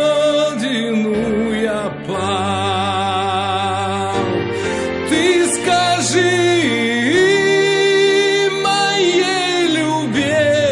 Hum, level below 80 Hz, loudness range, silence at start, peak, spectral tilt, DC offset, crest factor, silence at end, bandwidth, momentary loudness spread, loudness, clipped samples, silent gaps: none; -50 dBFS; 5 LU; 0 s; -2 dBFS; -4 dB/octave; under 0.1%; 14 dB; 0 s; 11.5 kHz; 6 LU; -16 LUFS; under 0.1%; none